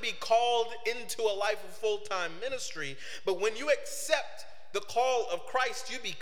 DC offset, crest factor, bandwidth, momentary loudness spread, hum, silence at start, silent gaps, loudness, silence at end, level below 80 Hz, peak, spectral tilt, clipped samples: 1%; 22 dB; 17 kHz; 9 LU; none; 0 s; none; -32 LUFS; 0 s; -70 dBFS; -10 dBFS; -1.5 dB/octave; under 0.1%